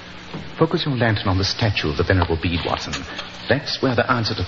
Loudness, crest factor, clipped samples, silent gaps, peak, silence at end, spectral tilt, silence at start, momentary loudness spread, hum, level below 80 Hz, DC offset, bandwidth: -21 LUFS; 20 dB; under 0.1%; none; -2 dBFS; 0 s; -5.5 dB/octave; 0 s; 11 LU; none; -40 dBFS; under 0.1%; 7.4 kHz